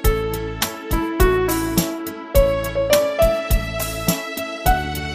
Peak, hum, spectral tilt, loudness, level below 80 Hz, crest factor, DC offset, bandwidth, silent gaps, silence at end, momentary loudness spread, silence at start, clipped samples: -2 dBFS; none; -4.5 dB/octave; -20 LUFS; -26 dBFS; 18 dB; under 0.1%; 15.5 kHz; none; 0 s; 7 LU; 0 s; under 0.1%